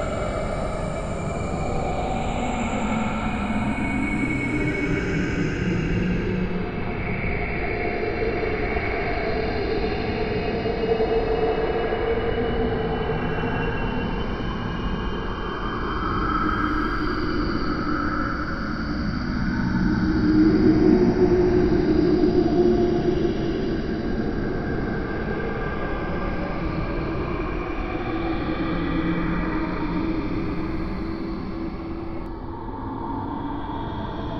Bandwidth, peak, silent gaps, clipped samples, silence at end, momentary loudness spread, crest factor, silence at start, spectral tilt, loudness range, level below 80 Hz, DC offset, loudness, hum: 9.6 kHz; -6 dBFS; none; under 0.1%; 0 s; 9 LU; 18 dB; 0 s; -7.5 dB/octave; 8 LU; -32 dBFS; under 0.1%; -25 LUFS; none